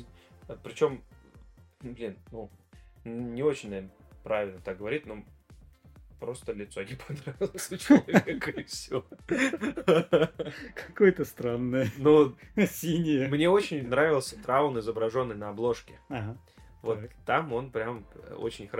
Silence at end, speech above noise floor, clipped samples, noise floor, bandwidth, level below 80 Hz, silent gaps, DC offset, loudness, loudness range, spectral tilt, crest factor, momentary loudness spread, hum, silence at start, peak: 0 s; 27 dB; under 0.1%; -55 dBFS; 16.5 kHz; -58 dBFS; none; under 0.1%; -28 LUFS; 12 LU; -6 dB/octave; 26 dB; 19 LU; none; 0 s; -4 dBFS